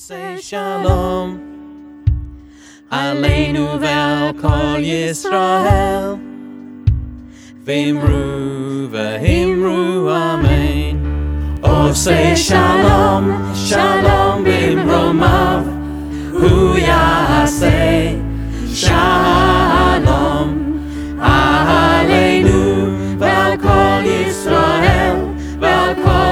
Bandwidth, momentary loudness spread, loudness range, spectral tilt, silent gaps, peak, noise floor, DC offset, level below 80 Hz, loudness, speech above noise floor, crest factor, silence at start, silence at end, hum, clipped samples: 16.5 kHz; 11 LU; 6 LU; -5.5 dB/octave; none; 0 dBFS; -40 dBFS; under 0.1%; -24 dBFS; -14 LUFS; 27 dB; 14 dB; 0 s; 0 s; none; under 0.1%